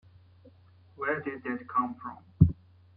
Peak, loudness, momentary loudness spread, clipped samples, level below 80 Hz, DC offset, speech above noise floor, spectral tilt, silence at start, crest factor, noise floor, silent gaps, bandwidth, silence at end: -4 dBFS; -30 LUFS; 17 LU; under 0.1%; -46 dBFS; under 0.1%; 24 dB; -11.5 dB/octave; 1 s; 26 dB; -58 dBFS; none; 4 kHz; 0.45 s